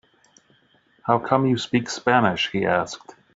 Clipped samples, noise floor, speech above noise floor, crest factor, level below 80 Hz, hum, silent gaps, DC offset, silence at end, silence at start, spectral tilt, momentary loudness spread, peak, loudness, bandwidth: under 0.1%; -61 dBFS; 39 dB; 20 dB; -60 dBFS; none; none; under 0.1%; 0.25 s; 1.05 s; -4 dB/octave; 12 LU; -4 dBFS; -22 LUFS; 7.8 kHz